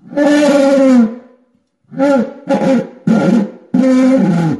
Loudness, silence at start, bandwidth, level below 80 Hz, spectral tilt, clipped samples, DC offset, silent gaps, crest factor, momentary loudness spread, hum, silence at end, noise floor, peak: -12 LUFS; 0.1 s; 11.5 kHz; -58 dBFS; -7 dB/octave; under 0.1%; under 0.1%; none; 12 dB; 7 LU; none; 0 s; -57 dBFS; 0 dBFS